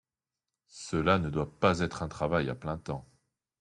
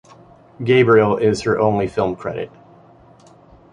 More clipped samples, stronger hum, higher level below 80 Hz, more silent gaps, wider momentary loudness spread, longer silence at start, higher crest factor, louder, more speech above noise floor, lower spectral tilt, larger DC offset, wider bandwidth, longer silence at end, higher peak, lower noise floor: neither; neither; about the same, -54 dBFS vs -50 dBFS; neither; second, 12 LU vs 15 LU; first, 0.75 s vs 0.6 s; first, 22 dB vs 16 dB; second, -31 LUFS vs -17 LUFS; first, over 60 dB vs 31 dB; about the same, -6 dB/octave vs -6.5 dB/octave; neither; about the same, 11 kHz vs 10 kHz; second, 0.6 s vs 1.25 s; second, -10 dBFS vs -2 dBFS; first, under -90 dBFS vs -47 dBFS